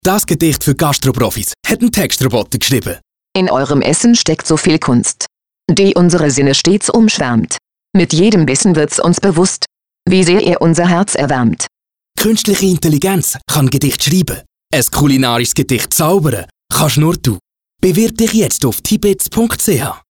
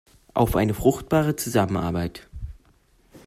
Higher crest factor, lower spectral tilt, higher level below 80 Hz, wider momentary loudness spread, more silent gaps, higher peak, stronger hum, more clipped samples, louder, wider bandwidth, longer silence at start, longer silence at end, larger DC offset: second, 10 dB vs 20 dB; second, -4.5 dB/octave vs -6 dB/octave; about the same, -38 dBFS vs -40 dBFS; second, 7 LU vs 19 LU; neither; first, -2 dBFS vs -6 dBFS; neither; neither; first, -12 LUFS vs -23 LUFS; first, over 20 kHz vs 16 kHz; second, 0.05 s vs 0.35 s; about the same, 0.15 s vs 0.1 s; neither